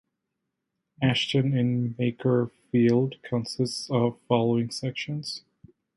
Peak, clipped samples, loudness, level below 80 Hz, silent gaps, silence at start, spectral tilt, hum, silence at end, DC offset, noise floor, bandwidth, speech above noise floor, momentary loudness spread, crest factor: -8 dBFS; under 0.1%; -26 LUFS; -64 dBFS; none; 1 s; -6.5 dB/octave; none; 0.6 s; under 0.1%; -82 dBFS; 11.5 kHz; 57 dB; 9 LU; 18 dB